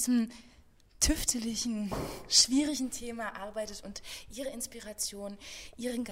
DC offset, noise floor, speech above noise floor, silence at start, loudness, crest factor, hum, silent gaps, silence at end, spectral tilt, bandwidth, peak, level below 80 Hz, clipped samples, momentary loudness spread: under 0.1%; -59 dBFS; 26 dB; 0 s; -31 LUFS; 22 dB; none; none; 0 s; -2 dB/octave; 16 kHz; -10 dBFS; -48 dBFS; under 0.1%; 18 LU